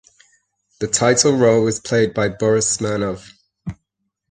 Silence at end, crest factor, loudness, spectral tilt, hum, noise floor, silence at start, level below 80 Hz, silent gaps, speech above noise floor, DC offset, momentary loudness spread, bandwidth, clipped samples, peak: 0.55 s; 18 dB; -17 LUFS; -4 dB/octave; none; -75 dBFS; 0.8 s; -50 dBFS; none; 58 dB; under 0.1%; 20 LU; 9.8 kHz; under 0.1%; -2 dBFS